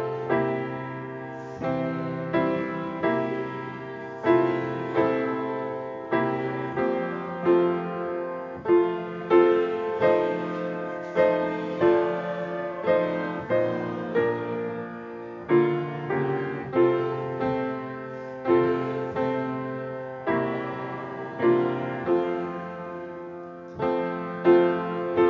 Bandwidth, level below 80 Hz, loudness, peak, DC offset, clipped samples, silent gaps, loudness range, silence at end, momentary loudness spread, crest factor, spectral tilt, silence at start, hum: 6.2 kHz; -62 dBFS; -26 LUFS; -6 dBFS; under 0.1%; under 0.1%; none; 4 LU; 0 s; 12 LU; 20 dB; -8.5 dB/octave; 0 s; none